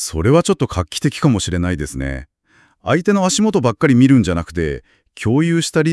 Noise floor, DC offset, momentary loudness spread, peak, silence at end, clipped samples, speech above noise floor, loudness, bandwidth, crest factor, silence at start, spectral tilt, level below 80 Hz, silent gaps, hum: -55 dBFS; under 0.1%; 12 LU; 0 dBFS; 0 s; under 0.1%; 40 dB; -16 LUFS; 12 kHz; 16 dB; 0 s; -5.5 dB/octave; -38 dBFS; none; none